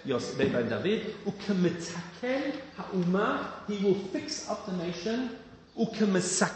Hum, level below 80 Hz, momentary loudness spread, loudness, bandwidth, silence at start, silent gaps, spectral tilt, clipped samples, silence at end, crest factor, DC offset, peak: none; -64 dBFS; 9 LU; -31 LUFS; 8.8 kHz; 0 s; none; -5 dB/octave; under 0.1%; 0 s; 20 dB; under 0.1%; -10 dBFS